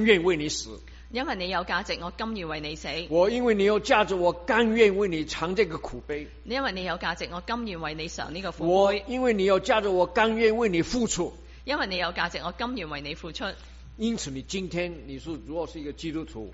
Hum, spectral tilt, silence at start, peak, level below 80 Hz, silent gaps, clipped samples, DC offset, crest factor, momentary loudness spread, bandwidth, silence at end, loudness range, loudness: none; -3 dB/octave; 0 s; -6 dBFS; -46 dBFS; none; under 0.1%; under 0.1%; 20 dB; 13 LU; 8 kHz; 0 s; 8 LU; -27 LUFS